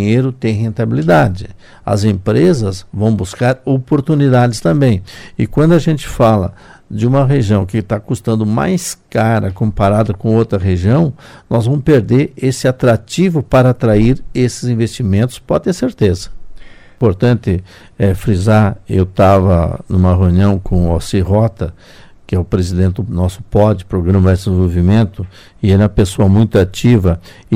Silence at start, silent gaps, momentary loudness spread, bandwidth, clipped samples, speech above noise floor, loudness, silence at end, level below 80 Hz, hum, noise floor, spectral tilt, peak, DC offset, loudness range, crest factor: 0 s; none; 7 LU; 15 kHz; under 0.1%; 19 dB; -13 LUFS; 0 s; -30 dBFS; none; -31 dBFS; -7.5 dB/octave; 0 dBFS; under 0.1%; 3 LU; 12 dB